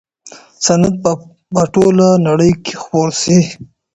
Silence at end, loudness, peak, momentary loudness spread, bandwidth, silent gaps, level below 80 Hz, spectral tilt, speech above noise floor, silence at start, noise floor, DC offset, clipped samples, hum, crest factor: 0.3 s; -13 LUFS; 0 dBFS; 10 LU; 8.4 kHz; none; -44 dBFS; -5.5 dB/octave; 28 dB; 0.25 s; -40 dBFS; under 0.1%; under 0.1%; none; 14 dB